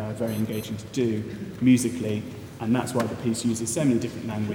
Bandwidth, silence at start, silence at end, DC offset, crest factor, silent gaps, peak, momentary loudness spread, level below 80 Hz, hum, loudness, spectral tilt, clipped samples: 18.5 kHz; 0 s; 0 s; under 0.1%; 18 dB; none; -8 dBFS; 11 LU; -58 dBFS; none; -26 LUFS; -5.5 dB/octave; under 0.1%